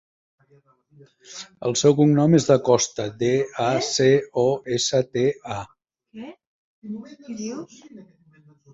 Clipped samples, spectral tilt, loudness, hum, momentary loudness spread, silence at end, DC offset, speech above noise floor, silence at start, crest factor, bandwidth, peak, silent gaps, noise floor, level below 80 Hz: under 0.1%; -5 dB/octave; -21 LUFS; none; 23 LU; 0.7 s; under 0.1%; 33 dB; 1.3 s; 20 dB; 8 kHz; -4 dBFS; 6.47-6.82 s; -55 dBFS; -60 dBFS